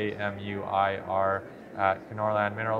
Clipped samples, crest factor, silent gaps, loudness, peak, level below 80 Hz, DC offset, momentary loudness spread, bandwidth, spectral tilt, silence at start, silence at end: under 0.1%; 20 dB; none; -29 LUFS; -10 dBFS; -66 dBFS; under 0.1%; 6 LU; 7.4 kHz; -7.5 dB/octave; 0 s; 0 s